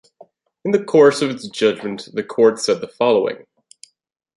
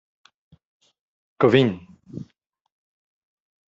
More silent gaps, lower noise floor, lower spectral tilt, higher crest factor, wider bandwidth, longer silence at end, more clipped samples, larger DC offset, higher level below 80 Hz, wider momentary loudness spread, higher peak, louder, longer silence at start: neither; second, -50 dBFS vs -67 dBFS; about the same, -4.5 dB/octave vs -5.5 dB/octave; second, 16 dB vs 24 dB; first, 11.5 kHz vs 7.6 kHz; second, 1.05 s vs 1.45 s; neither; neither; about the same, -66 dBFS vs -64 dBFS; second, 14 LU vs 22 LU; about the same, -2 dBFS vs -2 dBFS; about the same, -18 LUFS vs -19 LUFS; second, 0.65 s vs 1.4 s